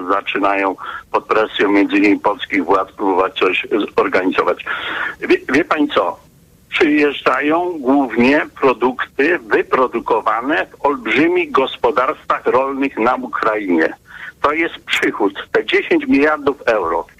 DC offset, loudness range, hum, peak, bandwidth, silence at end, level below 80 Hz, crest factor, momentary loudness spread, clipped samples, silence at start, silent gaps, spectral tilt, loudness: under 0.1%; 2 LU; none; -4 dBFS; 13.5 kHz; 0.15 s; -50 dBFS; 12 dB; 6 LU; under 0.1%; 0 s; none; -5 dB/octave; -16 LUFS